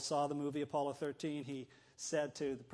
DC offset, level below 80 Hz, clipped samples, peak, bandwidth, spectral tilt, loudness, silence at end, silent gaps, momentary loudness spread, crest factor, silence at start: under 0.1%; -78 dBFS; under 0.1%; -24 dBFS; 11 kHz; -4.5 dB/octave; -40 LUFS; 0.05 s; none; 10 LU; 16 dB; 0 s